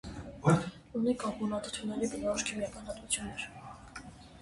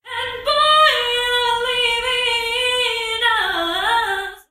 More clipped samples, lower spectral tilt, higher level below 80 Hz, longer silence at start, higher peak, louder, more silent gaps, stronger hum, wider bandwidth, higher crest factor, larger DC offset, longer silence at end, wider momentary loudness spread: neither; first, -5 dB/octave vs -0.5 dB/octave; second, -56 dBFS vs -48 dBFS; about the same, 0.05 s vs 0.05 s; second, -12 dBFS vs -2 dBFS; second, -34 LUFS vs -17 LUFS; neither; neither; second, 11.5 kHz vs 15.5 kHz; first, 22 dB vs 16 dB; neither; about the same, 0 s vs 0.1 s; first, 19 LU vs 7 LU